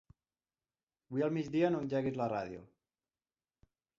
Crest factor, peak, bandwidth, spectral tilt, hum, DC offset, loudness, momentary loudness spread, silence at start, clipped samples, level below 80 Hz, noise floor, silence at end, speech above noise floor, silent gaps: 20 dB; -18 dBFS; 7.4 kHz; -7 dB/octave; none; under 0.1%; -35 LUFS; 10 LU; 1.1 s; under 0.1%; -72 dBFS; under -90 dBFS; 1.35 s; over 56 dB; none